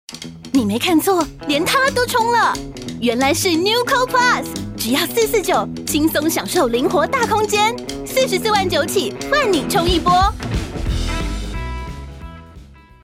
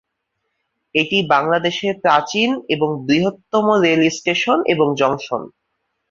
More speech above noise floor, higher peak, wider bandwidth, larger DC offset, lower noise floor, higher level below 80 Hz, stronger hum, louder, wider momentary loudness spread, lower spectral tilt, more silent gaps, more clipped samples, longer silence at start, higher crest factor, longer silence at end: second, 24 dB vs 57 dB; about the same, -2 dBFS vs -2 dBFS; first, 16.5 kHz vs 7.6 kHz; neither; second, -41 dBFS vs -74 dBFS; first, -32 dBFS vs -60 dBFS; neither; about the same, -17 LUFS vs -17 LUFS; first, 12 LU vs 5 LU; about the same, -3.5 dB/octave vs -4.5 dB/octave; neither; neither; second, 0.1 s vs 0.95 s; about the same, 16 dB vs 16 dB; second, 0.35 s vs 0.65 s